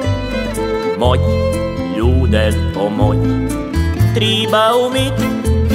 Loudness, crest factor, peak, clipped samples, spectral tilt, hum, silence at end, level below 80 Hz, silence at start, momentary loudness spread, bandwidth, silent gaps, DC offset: -15 LUFS; 14 dB; -2 dBFS; under 0.1%; -6 dB/octave; none; 0 s; -24 dBFS; 0 s; 6 LU; 16 kHz; none; under 0.1%